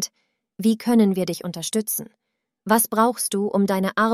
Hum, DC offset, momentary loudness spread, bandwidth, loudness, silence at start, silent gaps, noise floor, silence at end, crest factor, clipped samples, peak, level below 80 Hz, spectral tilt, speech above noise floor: none; under 0.1%; 9 LU; 15.5 kHz; -21 LUFS; 0 s; none; -72 dBFS; 0 s; 18 dB; under 0.1%; -4 dBFS; -66 dBFS; -4.5 dB/octave; 51 dB